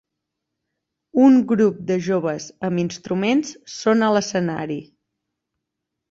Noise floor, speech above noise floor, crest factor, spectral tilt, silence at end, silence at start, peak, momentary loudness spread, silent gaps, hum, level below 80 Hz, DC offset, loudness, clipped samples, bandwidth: -81 dBFS; 62 dB; 18 dB; -6 dB/octave; 1.3 s; 1.15 s; -4 dBFS; 13 LU; none; none; -62 dBFS; under 0.1%; -20 LUFS; under 0.1%; 7.8 kHz